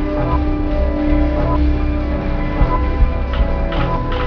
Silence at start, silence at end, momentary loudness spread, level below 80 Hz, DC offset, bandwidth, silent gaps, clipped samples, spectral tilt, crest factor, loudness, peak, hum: 0 s; 0 s; 3 LU; -18 dBFS; 0.5%; 5.4 kHz; none; under 0.1%; -9.5 dB/octave; 14 dB; -18 LUFS; -2 dBFS; none